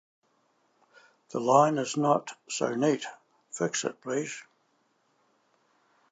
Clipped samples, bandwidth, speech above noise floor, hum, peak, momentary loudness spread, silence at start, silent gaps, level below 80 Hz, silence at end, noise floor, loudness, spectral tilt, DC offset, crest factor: under 0.1%; 9.2 kHz; 44 dB; none; -6 dBFS; 16 LU; 1.35 s; none; -86 dBFS; 1.7 s; -71 dBFS; -28 LUFS; -4.5 dB/octave; under 0.1%; 24 dB